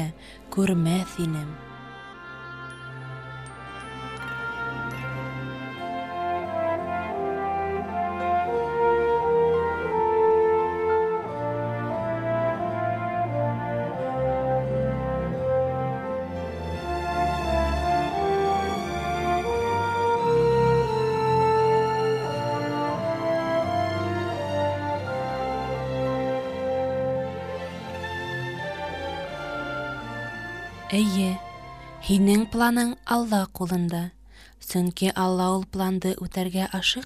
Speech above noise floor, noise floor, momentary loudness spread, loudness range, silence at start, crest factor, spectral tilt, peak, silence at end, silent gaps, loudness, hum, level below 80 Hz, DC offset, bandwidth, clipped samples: 21 dB; -46 dBFS; 13 LU; 9 LU; 0 s; 18 dB; -6 dB/octave; -8 dBFS; 0 s; none; -26 LUFS; none; -44 dBFS; under 0.1%; 15.5 kHz; under 0.1%